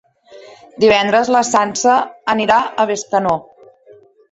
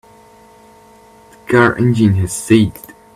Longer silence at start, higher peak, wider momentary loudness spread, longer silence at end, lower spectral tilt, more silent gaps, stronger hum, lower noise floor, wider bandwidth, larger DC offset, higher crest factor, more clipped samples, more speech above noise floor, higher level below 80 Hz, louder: second, 0.3 s vs 1.5 s; about the same, -2 dBFS vs 0 dBFS; about the same, 6 LU vs 7 LU; first, 0.9 s vs 0.35 s; second, -3 dB/octave vs -6 dB/octave; neither; neither; about the same, -46 dBFS vs -44 dBFS; second, 8.2 kHz vs 15 kHz; neither; about the same, 16 dB vs 16 dB; neither; about the same, 32 dB vs 31 dB; second, -54 dBFS vs -44 dBFS; about the same, -15 LUFS vs -13 LUFS